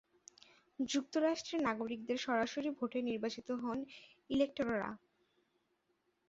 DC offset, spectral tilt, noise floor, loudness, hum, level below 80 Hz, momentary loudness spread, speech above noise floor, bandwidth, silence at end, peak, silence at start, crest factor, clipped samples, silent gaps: under 0.1%; -3 dB/octave; -80 dBFS; -38 LUFS; none; -72 dBFS; 10 LU; 43 dB; 8 kHz; 1.3 s; -22 dBFS; 0.8 s; 18 dB; under 0.1%; none